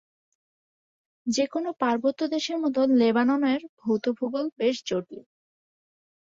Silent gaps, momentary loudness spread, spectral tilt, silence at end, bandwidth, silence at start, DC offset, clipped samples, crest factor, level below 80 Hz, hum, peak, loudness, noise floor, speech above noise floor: 3.69-3.77 s; 10 LU; -4.5 dB/octave; 1 s; 7.8 kHz; 1.25 s; under 0.1%; under 0.1%; 16 dB; -72 dBFS; none; -10 dBFS; -26 LUFS; under -90 dBFS; over 65 dB